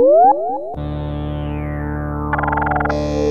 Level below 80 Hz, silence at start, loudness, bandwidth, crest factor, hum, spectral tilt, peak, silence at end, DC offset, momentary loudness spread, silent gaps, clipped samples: -30 dBFS; 0 s; -19 LUFS; 7.4 kHz; 14 dB; none; -8 dB/octave; -2 dBFS; 0 s; under 0.1%; 12 LU; none; under 0.1%